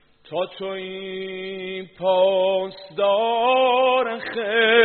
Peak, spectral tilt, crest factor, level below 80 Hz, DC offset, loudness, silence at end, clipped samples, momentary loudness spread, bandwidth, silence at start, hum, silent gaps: -2 dBFS; -0.5 dB/octave; 18 dB; -68 dBFS; under 0.1%; -22 LUFS; 0 s; under 0.1%; 13 LU; 4.5 kHz; 0.3 s; none; none